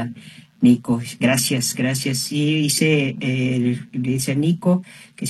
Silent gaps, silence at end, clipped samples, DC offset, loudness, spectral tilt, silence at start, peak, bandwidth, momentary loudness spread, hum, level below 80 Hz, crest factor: none; 0 s; under 0.1%; under 0.1%; -19 LUFS; -5 dB/octave; 0 s; -4 dBFS; 13.5 kHz; 7 LU; none; -58 dBFS; 16 dB